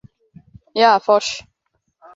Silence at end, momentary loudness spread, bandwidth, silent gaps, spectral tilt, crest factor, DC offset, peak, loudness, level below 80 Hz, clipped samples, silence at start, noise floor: 0.75 s; 14 LU; 7.8 kHz; none; -2.5 dB/octave; 18 dB; under 0.1%; -2 dBFS; -16 LUFS; -60 dBFS; under 0.1%; 0.75 s; -71 dBFS